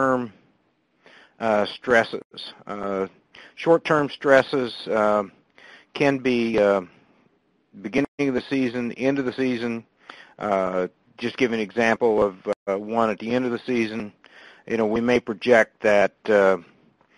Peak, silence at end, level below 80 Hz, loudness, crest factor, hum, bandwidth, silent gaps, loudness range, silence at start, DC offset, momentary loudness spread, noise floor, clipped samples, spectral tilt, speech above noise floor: -2 dBFS; 0.55 s; -58 dBFS; -22 LUFS; 22 dB; none; 11 kHz; 2.25-2.30 s, 8.08-8.18 s, 12.56-12.66 s; 4 LU; 0 s; under 0.1%; 13 LU; -66 dBFS; under 0.1%; -6 dB/octave; 44 dB